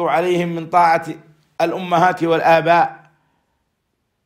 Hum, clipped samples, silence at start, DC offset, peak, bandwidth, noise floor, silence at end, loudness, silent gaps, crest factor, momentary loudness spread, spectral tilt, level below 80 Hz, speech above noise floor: none; under 0.1%; 0 s; under 0.1%; -2 dBFS; 15 kHz; -71 dBFS; 1.3 s; -16 LUFS; none; 16 dB; 9 LU; -6 dB/octave; -62 dBFS; 55 dB